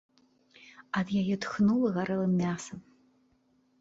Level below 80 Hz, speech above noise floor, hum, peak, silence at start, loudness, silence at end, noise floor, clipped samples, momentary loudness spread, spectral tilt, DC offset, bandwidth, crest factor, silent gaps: -64 dBFS; 41 dB; none; -16 dBFS; 0.8 s; -29 LUFS; 1 s; -69 dBFS; under 0.1%; 12 LU; -6.5 dB/octave; under 0.1%; 8 kHz; 14 dB; none